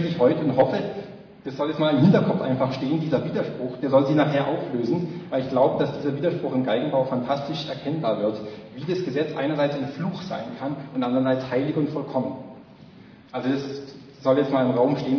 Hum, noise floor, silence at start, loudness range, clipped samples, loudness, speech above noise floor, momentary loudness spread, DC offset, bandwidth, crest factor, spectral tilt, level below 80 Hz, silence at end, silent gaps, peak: none; -47 dBFS; 0 s; 5 LU; under 0.1%; -24 LUFS; 24 dB; 12 LU; under 0.1%; 5.4 kHz; 18 dB; -8.5 dB/octave; -62 dBFS; 0 s; none; -6 dBFS